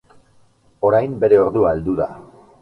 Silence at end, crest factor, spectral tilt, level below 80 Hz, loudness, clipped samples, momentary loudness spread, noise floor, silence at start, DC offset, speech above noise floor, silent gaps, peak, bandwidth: 0.4 s; 16 dB; -9.5 dB/octave; -46 dBFS; -17 LUFS; under 0.1%; 9 LU; -55 dBFS; 0.8 s; under 0.1%; 38 dB; none; -2 dBFS; 4.6 kHz